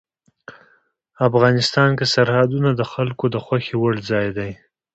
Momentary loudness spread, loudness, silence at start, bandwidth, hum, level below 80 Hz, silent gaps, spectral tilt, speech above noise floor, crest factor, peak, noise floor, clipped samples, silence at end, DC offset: 8 LU; -18 LUFS; 0.5 s; 8.2 kHz; none; -52 dBFS; none; -6 dB/octave; 42 dB; 18 dB; -2 dBFS; -60 dBFS; under 0.1%; 0.4 s; under 0.1%